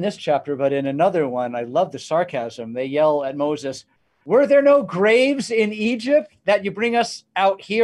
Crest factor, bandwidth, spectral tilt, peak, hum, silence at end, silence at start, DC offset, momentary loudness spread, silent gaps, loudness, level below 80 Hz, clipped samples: 14 dB; 11.5 kHz; -5 dB/octave; -4 dBFS; none; 0 s; 0 s; under 0.1%; 9 LU; none; -20 LUFS; -68 dBFS; under 0.1%